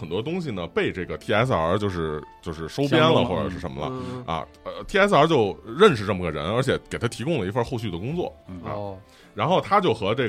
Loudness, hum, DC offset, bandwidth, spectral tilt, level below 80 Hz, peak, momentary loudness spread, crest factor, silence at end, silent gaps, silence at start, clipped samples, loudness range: -23 LUFS; none; under 0.1%; 13.5 kHz; -6 dB/octave; -48 dBFS; -4 dBFS; 15 LU; 20 dB; 0 s; none; 0 s; under 0.1%; 5 LU